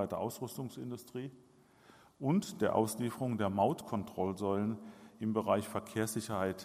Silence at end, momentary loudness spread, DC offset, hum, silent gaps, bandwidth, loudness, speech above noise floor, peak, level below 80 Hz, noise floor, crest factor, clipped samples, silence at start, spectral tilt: 0 s; 12 LU; under 0.1%; none; none; 15.5 kHz; -36 LUFS; 27 dB; -16 dBFS; -74 dBFS; -62 dBFS; 20 dB; under 0.1%; 0 s; -6 dB/octave